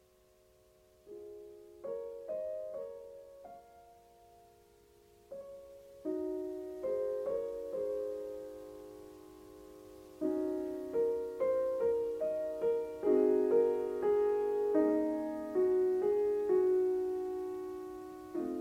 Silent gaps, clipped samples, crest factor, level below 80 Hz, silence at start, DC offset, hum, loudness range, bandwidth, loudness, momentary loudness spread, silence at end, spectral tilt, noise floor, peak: none; under 0.1%; 16 dB; -70 dBFS; 1.05 s; under 0.1%; 50 Hz at -75 dBFS; 14 LU; 15.5 kHz; -34 LUFS; 22 LU; 0 s; -7 dB/octave; -66 dBFS; -18 dBFS